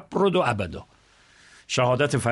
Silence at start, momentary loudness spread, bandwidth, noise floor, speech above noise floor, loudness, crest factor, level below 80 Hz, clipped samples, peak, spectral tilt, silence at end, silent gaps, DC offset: 0 s; 11 LU; 11.5 kHz; -56 dBFS; 33 dB; -24 LUFS; 16 dB; -54 dBFS; under 0.1%; -8 dBFS; -5 dB/octave; 0 s; none; under 0.1%